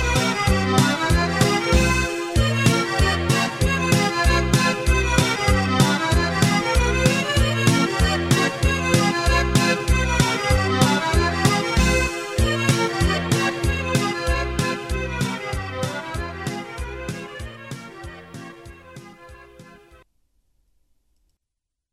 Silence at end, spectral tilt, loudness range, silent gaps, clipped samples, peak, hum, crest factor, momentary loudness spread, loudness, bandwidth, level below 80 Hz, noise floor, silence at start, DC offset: 2.3 s; -4.5 dB/octave; 13 LU; none; under 0.1%; -2 dBFS; none; 18 dB; 13 LU; -20 LUFS; 16 kHz; -28 dBFS; -81 dBFS; 0 s; under 0.1%